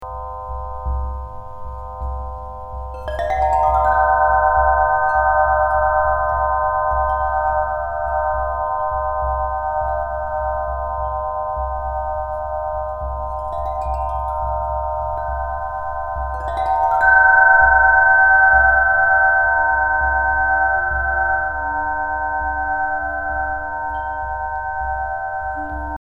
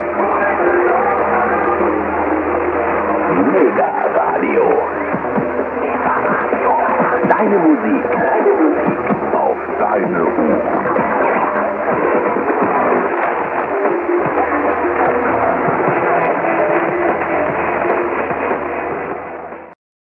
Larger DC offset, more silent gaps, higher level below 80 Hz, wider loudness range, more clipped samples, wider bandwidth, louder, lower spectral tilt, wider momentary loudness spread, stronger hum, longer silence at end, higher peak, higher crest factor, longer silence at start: neither; neither; first, -30 dBFS vs -46 dBFS; first, 11 LU vs 2 LU; neither; first, 7.6 kHz vs 4.4 kHz; second, -18 LUFS vs -15 LUFS; second, -7 dB/octave vs -9.5 dB/octave; first, 15 LU vs 5 LU; neither; second, 0.05 s vs 0.25 s; about the same, -2 dBFS vs 0 dBFS; about the same, 16 dB vs 16 dB; about the same, 0 s vs 0 s